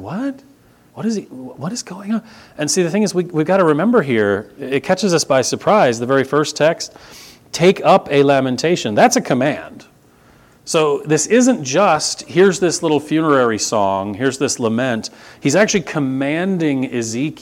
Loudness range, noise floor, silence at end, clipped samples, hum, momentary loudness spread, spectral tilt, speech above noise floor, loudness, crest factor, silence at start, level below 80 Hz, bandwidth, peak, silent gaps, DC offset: 3 LU; -49 dBFS; 0.05 s; under 0.1%; none; 11 LU; -4.5 dB/octave; 33 dB; -16 LUFS; 16 dB; 0 s; -58 dBFS; 16.5 kHz; 0 dBFS; none; under 0.1%